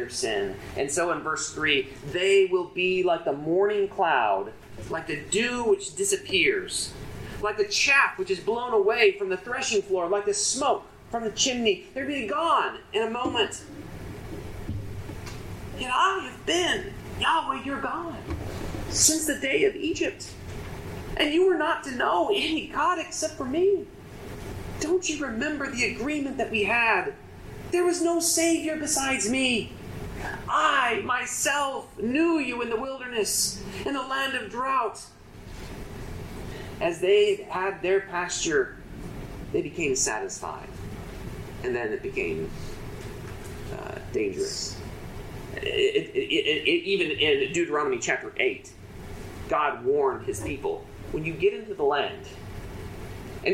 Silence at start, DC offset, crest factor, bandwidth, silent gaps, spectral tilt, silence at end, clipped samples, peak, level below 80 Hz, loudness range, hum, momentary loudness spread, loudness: 0 s; under 0.1%; 22 dB; 15.5 kHz; none; -3 dB/octave; 0 s; under 0.1%; -6 dBFS; -48 dBFS; 6 LU; none; 17 LU; -26 LUFS